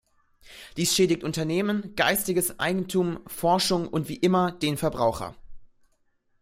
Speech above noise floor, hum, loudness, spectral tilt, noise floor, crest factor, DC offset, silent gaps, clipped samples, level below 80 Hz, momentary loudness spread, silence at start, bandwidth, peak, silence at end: 43 dB; none; -25 LUFS; -4 dB/octave; -68 dBFS; 20 dB; under 0.1%; none; under 0.1%; -54 dBFS; 8 LU; 0.5 s; 16 kHz; -6 dBFS; 0.75 s